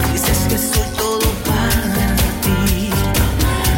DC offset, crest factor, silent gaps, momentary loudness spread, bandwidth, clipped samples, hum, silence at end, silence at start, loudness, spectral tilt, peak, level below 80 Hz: under 0.1%; 12 dB; none; 2 LU; 17 kHz; under 0.1%; none; 0 s; 0 s; -16 LUFS; -4.5 dB/octave; -4 dBFS; -22 dBFS